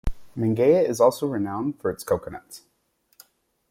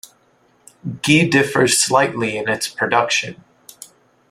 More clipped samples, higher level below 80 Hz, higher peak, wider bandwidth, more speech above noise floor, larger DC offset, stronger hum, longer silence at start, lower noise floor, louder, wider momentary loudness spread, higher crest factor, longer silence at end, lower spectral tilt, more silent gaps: neither; first, -40 dBFS vs -58 dBFS; second, -6 dBFS vs 0 dBFS; about the same, 16.5 kHz vs 16 kHz; first, 45 dB vs 40 dB; neither; neither; second, 0.05 s vs 0.85 s; first, -68 dBFS vs -57 dBFS; second, -23 LUFS vs -16 LUFS; about the same, 14 LU vs 13 LU; about the same, 20 dB vs 18 dB; first, 1.1 s vs 0.45 s; first, -6.5 dB/octave vs -3.5 dB/octave; neither